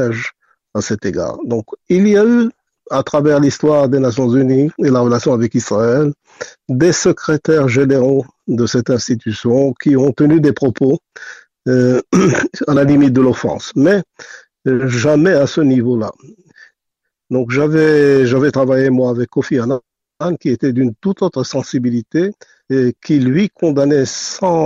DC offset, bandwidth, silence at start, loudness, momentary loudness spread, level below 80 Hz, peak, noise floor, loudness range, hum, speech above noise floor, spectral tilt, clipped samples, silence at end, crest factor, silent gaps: under 0.1%; 8 kHz; 0 s; -14 LUFS; 10 LU; -50 dBFS; -2 dBFS; -76 dBFS; 3 LU; none; 63 dB; -6.5 dB/octave; under 0.1%; 0 s; 12 dB; none